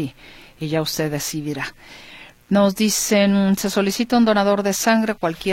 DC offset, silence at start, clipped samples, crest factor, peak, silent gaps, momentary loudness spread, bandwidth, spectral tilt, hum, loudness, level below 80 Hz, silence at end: under 0.1%; 0 s; under 0.1%; 16 dB; -4 dBFS; none; 13 LU; 16.5 kHz; -4.5 dB/octave; none; -19 LUFS; -52 dBFS; 0 s